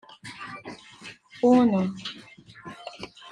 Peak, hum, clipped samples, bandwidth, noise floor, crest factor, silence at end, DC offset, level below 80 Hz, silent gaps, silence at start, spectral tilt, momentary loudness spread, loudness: -8 dBFS; none; under 0.1%; 10 kHz; -47 dBFS; 20 dB; 0 s; under 0.1%; -68 dBFS; none; 0.25 s; -6.5 dB/octave; 24 LU; -23 LUFS